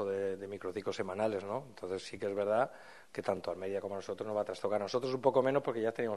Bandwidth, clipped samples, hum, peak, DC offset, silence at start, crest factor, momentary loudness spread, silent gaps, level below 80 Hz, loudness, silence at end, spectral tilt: 12 kHz; under 0.1%; none; -14 dBFS; under 0.1%; 0 s; 22 dB; 10 LU; none; -76 dBFS; -36 LUFS; 0 s; -6 dB/octave